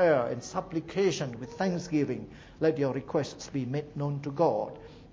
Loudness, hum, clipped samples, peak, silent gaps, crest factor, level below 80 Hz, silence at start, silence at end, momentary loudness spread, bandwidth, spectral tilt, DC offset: -31 LUFS; none; under 0.1%; -12 dBFS; none; 18 dB; -60 dBFS; 0 s; 0 s; 8 LU; 8 kHz; -6 dB/octave; under 0.1%